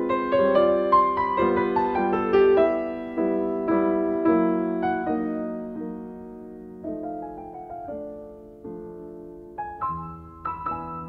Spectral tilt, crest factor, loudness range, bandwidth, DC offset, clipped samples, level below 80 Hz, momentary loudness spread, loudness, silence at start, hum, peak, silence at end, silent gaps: -9 dB/octave; 16 dB; 15 LU; 5.4 kHz; under 0.1%; under 0.1%; -52 dBFS; 20 LU; -24 LUFS; 0 s; none; -8 dBFS; 0 s; none